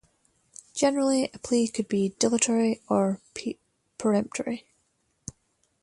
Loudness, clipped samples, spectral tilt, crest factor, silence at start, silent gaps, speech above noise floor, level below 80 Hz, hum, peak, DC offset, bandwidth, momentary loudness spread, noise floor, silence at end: -26 LUFS; under 0.1%; -4.5 dB/octave; 20 dB; 0.75 s; none; 47 dB; -64 dBFS; none; -8 dBFS; under 0.1%; 11.5 kHz; 21 LU; -72 dBFS; 1.2 s